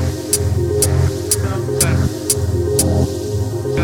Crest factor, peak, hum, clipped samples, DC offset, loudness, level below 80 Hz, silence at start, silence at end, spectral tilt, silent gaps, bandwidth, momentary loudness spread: 16 dB; 0 dBFS; none; under 0.1%; under 0.1%; -17 LUFS; -30 dBFS; 0 s; 0 s; -5 dB/octave; none; 19 kHz; 5 LU